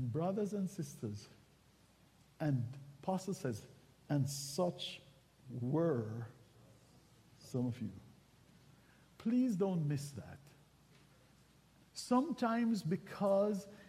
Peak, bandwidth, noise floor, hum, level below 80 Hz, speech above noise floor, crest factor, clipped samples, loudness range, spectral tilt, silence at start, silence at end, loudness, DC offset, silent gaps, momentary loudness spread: -22 dBFS; 15.5 kHz; -68 dBFS; none; -74 dBFS; 30 dB; 18 dB; under 0.1%; 4 LU; -6.5 dB/octave; 0 s; 0 s; -38 LUFS; under 0.1%; none; 17 LU